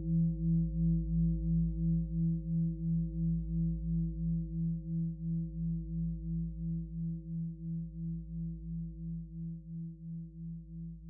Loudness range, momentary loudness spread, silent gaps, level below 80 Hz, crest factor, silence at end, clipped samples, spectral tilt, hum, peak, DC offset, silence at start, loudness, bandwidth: 9 LU; 12 LU; none; -42 dBFS; 12 dB; 0 s; under 0.1%; -15.5 dB/octave; none; -22 dBFS; under 0.1%; 0 s; -36 LUFS; 0.6 kHz